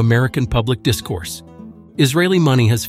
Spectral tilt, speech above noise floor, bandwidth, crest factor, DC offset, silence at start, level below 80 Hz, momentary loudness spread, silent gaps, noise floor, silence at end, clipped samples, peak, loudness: -5.5 dB/octave; 22 dB; 15.5 kHz; 16 dB; under 0.1%; 0 s; -38 dBFS; 15 LU; none; -38 dBFS; 0 s; under 0.1%; 0 dBFS; -17 LUFS